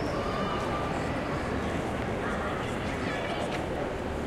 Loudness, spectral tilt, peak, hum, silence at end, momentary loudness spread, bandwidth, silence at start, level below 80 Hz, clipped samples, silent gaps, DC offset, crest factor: -31 LUFS; -6 dB/octave; -18 dBFS; none; 0 s; 2 LU; 15.5 kHz; 0 s; -42 dBFS; under 0.1%; none; under 0.1%; 14 dB